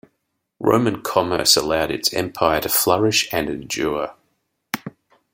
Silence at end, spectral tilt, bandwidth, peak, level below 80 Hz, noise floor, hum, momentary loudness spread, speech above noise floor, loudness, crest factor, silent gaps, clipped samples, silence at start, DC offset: 0.45 s; -3 dB/octave; 16.5 kHz; 0 dBFS; -50 dBFS; -74 dBFS; none; 14 LU; 55 dB; -19 LUFS; 20 dB; none; under 0.1%; 0.6 s; under 0.1%